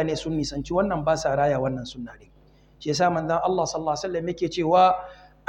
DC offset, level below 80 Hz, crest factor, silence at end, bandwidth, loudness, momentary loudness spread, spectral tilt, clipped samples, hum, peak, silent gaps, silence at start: under 0.1%; -48 dBFS; 18 dB; 0.35 s; 10.5 kHz; -24 LUFS; 15 LU; -5.5 dB/octave; under 0.1%; none; -6 dBFS; none; 0 s